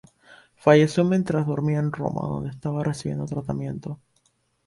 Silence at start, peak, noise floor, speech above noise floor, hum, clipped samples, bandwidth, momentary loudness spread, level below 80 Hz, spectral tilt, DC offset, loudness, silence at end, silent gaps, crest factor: 0.3 s; -4 dBFS; -67 dBFS; 44 dB; none; under 0.1%; 11.5 kHz; 14 LU; -54 dBFS; -7.5 dB/octave; under 0.1%; -24 LUFS; 0.7 s; none; 20 dB